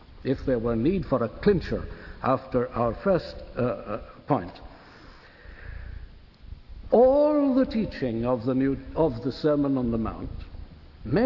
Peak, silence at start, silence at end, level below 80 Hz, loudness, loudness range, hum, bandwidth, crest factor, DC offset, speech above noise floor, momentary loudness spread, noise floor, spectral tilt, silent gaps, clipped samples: -8 dBFS; 0.1 s; 0 s; -44 dBFS; -26 LUFS; 8 LU; none; 6 kHz; 20 dB; under 0.1%; 24 dB; 21 LU; -49 dBFS; -9.5 dB/octave; none; under 0.1%